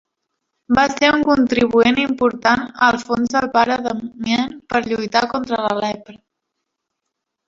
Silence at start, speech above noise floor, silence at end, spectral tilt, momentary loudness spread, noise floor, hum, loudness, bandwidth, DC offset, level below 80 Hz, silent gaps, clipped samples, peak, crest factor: 0.7 s; 61 dB; 1.3 s; -4.5 dB/octave; 8 LU; -78 dBFS; none; -17 LUFS; 7.6 kHz; under 0.1%; -50 dBFS; none; under 0.1%; 0 dBFS; 18 dB